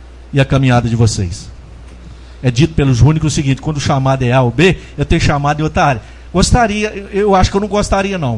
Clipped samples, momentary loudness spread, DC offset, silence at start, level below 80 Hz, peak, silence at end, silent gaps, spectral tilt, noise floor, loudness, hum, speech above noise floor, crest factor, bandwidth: under 0.1%; 8 LU; under 0.1%; 0 s; -26 dBFS; 0 dBFS; 0 s; none; -6 dB/octave; -33 dBFS; -13 LUFS; none; 21 dB; 14 dB; 11.5 kHz